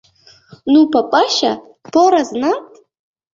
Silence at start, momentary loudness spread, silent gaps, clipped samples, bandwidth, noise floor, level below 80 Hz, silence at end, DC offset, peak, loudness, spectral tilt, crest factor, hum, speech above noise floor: 0.65 s; 11 LU; none; under 0.1%; 7.6 kHz; -45 dBFS; -60 dBFS; 0.7 s; under 0.1%; 0 dBFS; -14 LUFS; -3.5 dB/octave; 14 dB; none; 32 dB